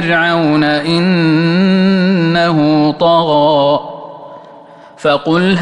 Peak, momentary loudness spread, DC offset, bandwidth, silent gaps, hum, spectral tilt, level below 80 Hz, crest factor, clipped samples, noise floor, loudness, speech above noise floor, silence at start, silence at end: -2 dBFS; 8 LU; under 0.1%; 9.8 kHz; none; none; -7 dB/octave; -52 dBFS; 10 dB; under 0.1%; -37 dBFS; -11 LUFS; 26 dB; 0 s; 0 s